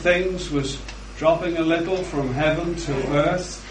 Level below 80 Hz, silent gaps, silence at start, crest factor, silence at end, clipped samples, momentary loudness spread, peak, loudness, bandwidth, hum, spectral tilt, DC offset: -38 dBFS; none; 0 s; 18 dB; 0 s; under 0.1%; 6 LU; -6 dBFS; -23 LUFS; 10.5 kHz; none; -5.5 dB/octave; under 0.1%